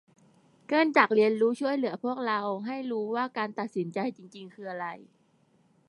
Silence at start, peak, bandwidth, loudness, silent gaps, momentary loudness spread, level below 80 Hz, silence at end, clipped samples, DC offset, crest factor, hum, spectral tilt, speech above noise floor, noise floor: 0.7 s; -6 dBFS; 11 kHz; -28 LUFS; none; 17 LU; -84 dBFS; 0.85 s; under 0.1%; under 0.1%; 24 dB; none; -6 dB/octave; 38 dB; -66 dBFS